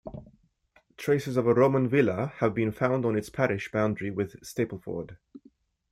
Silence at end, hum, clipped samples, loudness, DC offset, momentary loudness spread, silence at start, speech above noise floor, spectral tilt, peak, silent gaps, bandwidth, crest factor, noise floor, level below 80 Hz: 0.55 s; none; under 0.1%; -27 LUFS; under 0.1%; 14 LU; 0.05 s; 39 dB; -7.5 dB/octave; -8 dBFS; none; 15.5 kHz; 20 dB; -65 dBFS; -60 dBFS